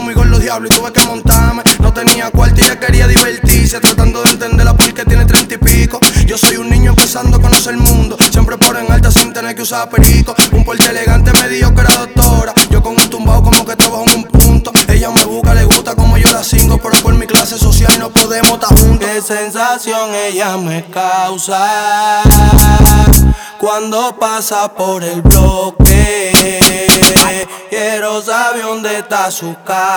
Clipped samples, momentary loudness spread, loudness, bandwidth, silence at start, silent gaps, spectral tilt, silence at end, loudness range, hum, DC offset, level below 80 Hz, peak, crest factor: 0.7%; 8 LU; -9 LUFS; over 20 kHz; 0 s; none; -3.5 dB/octave; 0 s; 2 LU; none; under 0.1%; -12 dBFS; 0 dBFS; 8 dB